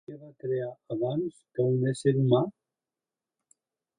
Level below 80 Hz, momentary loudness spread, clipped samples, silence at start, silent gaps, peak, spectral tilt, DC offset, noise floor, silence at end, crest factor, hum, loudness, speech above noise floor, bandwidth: -68 dBFS; 11 LU; under 0.1%; 0.1 s; none; -10 dBFS; -8 dB/octave; under 0.1%; under -90 dBFS; 1.5 s; 20 dB; none; -29 LUFS; over 63 dB; 10.5 kHz